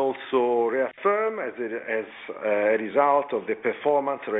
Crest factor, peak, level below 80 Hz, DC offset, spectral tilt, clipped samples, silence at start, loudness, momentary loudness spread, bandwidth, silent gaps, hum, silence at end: 16 dB; -8 dBFS; -72 dBFS; under 0.1%; -7.5 dB/octave; under 0.1%; 0 s; -25 LUFS; 9 LU; 4 kHz; none; none; 0 s